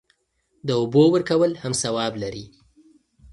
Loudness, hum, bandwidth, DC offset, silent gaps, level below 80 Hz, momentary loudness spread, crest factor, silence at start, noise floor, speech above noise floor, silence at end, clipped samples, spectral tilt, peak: -21 LUFS; none; 11.5 kHz; under 0.1%; none; -56 dBFS; 15 LU; 18 dB; 0.65 s; -69 dBFS; 48 dB; 0.85 s; under 0.1%; -5 dB/octave; -6 dBFS